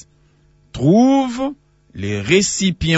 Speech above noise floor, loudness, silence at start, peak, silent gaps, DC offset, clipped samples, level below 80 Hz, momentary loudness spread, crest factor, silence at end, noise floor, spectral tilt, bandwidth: 39 dB; -16 LUFS; 0.75 s; -2 dBFS; none; under 0.1%; under 0.1%; -42 dBFS; 13 LU; 16 dB; 0 s; -54 dBFS; -5 dB/octave; 8 kHz